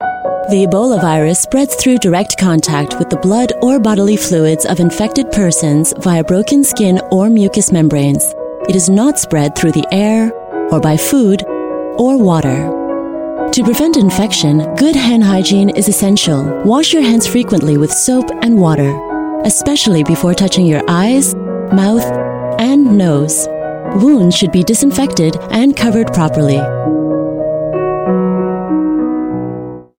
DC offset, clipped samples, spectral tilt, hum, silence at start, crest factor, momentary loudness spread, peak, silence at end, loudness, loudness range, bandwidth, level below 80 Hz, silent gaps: under 0.1%; under 0.1%; -5 dB/octave; none; 0 s; 10 dB; 7 LU; 0 dBFS; 0.15 s; -11 LUFS; 2 LU; 17 kHz; -40 dBFS; none